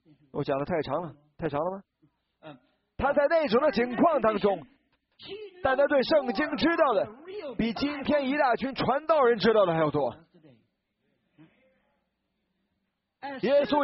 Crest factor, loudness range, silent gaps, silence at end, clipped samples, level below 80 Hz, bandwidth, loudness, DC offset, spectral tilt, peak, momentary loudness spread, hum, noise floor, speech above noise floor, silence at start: 18 dB; 6 LU; none; 0 s; under 0.1%; -58 dBFS; 5.8 kHz; -26 LUFS; under 0.1%; -4 dB/octave; -10 dBFS; 14 LU; none; -79 dBFS; 54 dB; 0.35 s